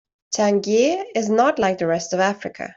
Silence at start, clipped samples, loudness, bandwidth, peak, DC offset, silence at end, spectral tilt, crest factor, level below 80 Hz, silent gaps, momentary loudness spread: 0.3 s; under 0.1%; -20 LUFS; 7.8 kHz; -6 dBFS; under 0.1%; 0.05 s; -4.5 dB/octave; 14 dB; -60 dBFS; none; 5 LU